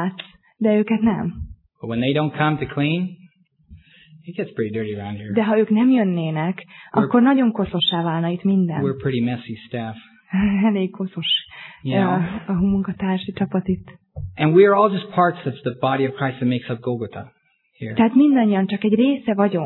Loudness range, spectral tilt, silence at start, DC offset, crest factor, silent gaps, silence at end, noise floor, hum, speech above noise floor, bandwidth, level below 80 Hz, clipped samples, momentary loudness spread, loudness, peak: 5 LU; -10.5 dB/octave; 0 s; under 0.1%; 18 dB; none; 0 s; -53 dBFS; none; 33 dB; 4.2 kHz; -50 dBFS; under 0.1%; 15 LU; -20 LUFS; -2 dBFS